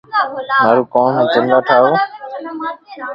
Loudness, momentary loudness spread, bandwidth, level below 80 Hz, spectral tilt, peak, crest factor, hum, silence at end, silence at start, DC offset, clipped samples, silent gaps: -14 LUFS; 14 LU; 5.8 kHz; -62 dBFS; -7.5 dB/octave; 0 dBFS; 14 dB; none; 0 s; 0.1 s; under 0.1%; under 0.1%; none